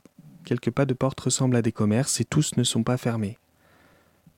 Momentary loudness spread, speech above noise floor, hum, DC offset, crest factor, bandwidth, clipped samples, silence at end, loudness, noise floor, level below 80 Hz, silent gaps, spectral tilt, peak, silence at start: 6 LU; 35 dB; none; under 0.1%; 16 dB; 16.5 kHz; under 0.1%; 1.05 s; -25 LUFS; -59 dBFS; -58 dBFS; none; -5 dB/octave; -10 dBFS; 0.25 s